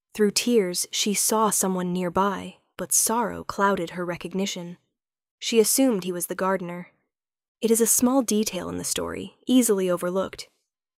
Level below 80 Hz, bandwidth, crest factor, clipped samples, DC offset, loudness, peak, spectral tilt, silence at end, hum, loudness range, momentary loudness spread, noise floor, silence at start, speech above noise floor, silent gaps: -60 dBFS; 16.5 kHz; 18 dB; under 0.1%; under 0.1%; -23 LUFS; -6 dBFS; -3.5 dB/octave; 0.55 s; none; 3 LU; 14 LU; -80 dBFS; 0.15 s; 56 dB; 5.31-5.38 s, 7.48-7.55 s